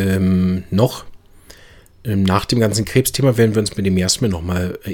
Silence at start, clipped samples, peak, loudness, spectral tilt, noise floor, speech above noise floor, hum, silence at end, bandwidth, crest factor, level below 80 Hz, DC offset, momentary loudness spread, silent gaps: 0 s; under 0.1%; -2 dBFS; -17 LUFS; -5.5 dB/octave; -45 dBFS; 28 dB; none; 0 s; 17.5 kHz; 16 dB; -40 dBFS; under 0.1%; 7 LU; none